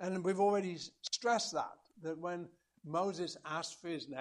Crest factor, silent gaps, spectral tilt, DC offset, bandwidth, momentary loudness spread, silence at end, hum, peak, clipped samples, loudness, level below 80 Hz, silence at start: 18 dB; none; -4 dB/octave; under 0.1%; 12 kHz; 13 LU; 0 s; none; -20 dBFS; under 0.1%; -38 LUFS; -82 dBFS; 0 s